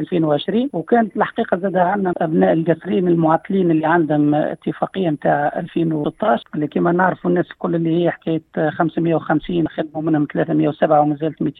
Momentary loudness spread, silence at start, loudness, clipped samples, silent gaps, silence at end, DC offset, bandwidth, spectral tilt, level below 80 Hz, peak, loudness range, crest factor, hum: 6 LU; 0 s; -18 LUFS; under 0.1%; none; 0.1 s; under 0.1%; 4.1 kHz; -10 dB/octave; -54 dBFS; -2 dBFS; 2 LU; 16 dB; none